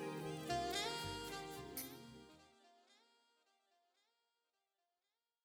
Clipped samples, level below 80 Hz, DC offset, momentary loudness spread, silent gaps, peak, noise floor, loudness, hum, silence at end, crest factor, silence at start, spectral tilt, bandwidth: under 0.1%; -70 dBFS; under 0.1%; 18 LU; none; -28 dBFS; under -90 dBFS; -45 LUFS; none; 2.5 s; 22 dB; 0 s; -3.5 dB/octave; over 20 kHz